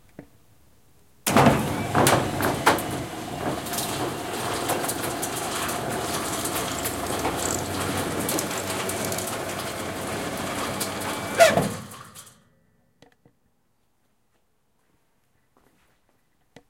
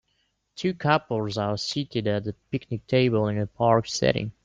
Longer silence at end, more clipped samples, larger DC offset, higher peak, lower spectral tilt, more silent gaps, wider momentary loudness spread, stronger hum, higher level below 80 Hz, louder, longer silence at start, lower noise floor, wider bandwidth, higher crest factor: about the same, 0.1 s vs 0.15 s; neither; neither; first, -2 dBFS vs -6 dBFS; second, -3.5 dB/octave vs -5.5 dB/octave; neither; about the same, 11 LU vs 10 LU; neither; about the same, -52 dBFS vs -56 dBFS; about the same, -25 LUFS vs -25 LUFS; second, 0.2 s vs 0.55 s; about the same, -71 dBFS vs -72 dBFS; first, 17 kHz vs 9.2 kHz; about the same, 24 dB vs 20 dB